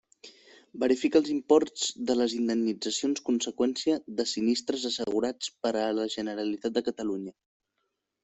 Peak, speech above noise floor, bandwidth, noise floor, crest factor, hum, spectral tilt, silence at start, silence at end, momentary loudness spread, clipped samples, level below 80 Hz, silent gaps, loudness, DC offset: -10 dBFS; 53 dB; 8.4 kHz; -81 dBFS; 20 dB; none; -3.5 dB/octave; 0.25 s; 0.9 s; 8 LU; under 0.1%; -70 dBFS; none; -28 LUFS; under 0.1%